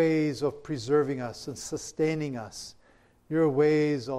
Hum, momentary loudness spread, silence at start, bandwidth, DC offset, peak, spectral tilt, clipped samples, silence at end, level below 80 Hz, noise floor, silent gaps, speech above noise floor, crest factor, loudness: none; 14 LU; 0 s; 13.5 kHz; under 0.1%; -12 dBFS; -6 dB/octave; under 0.1%; 0 s; -62 dBFS; -61 dBFS; none; 34 dB; 14 dB; -28 LUFS